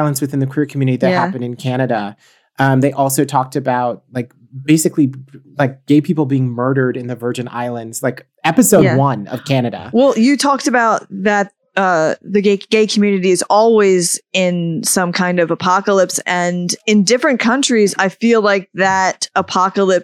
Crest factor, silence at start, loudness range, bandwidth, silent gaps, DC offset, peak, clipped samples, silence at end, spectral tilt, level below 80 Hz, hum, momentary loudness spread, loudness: 14 dB; 0 s; 3 LU; 19 kHz; none; under 0.1%; 0 dBFS; under 0.1%; 0 s; -5 dB/octave; -62 dBFS; none; 9 LU; -15 LUFS